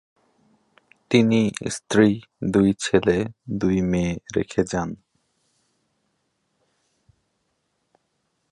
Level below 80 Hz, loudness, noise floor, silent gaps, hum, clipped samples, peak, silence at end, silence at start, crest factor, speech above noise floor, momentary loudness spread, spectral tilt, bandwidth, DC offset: -48 dBFS; -22 LUFS; -73 dBFS; none; none; under 0.1%; -2 dBFS; 3.55 s; 1.1 s; 22 dB; 52 dB; 10 LU; -6 dB/octave; 11.5 kHz; under 0.1%